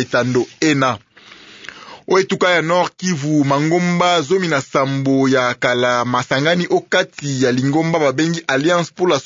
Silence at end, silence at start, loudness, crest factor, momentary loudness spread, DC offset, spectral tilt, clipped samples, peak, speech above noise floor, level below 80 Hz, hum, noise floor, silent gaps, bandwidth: 0 s; 0 s; -16 LUFS; 14 dB; 5 LU; under 0.1%; -5 dB/octave; under 0.1%; -2 dBFS; 26 dB; -60 dBFS; none; -42 dBFS; none; 7.8 kHz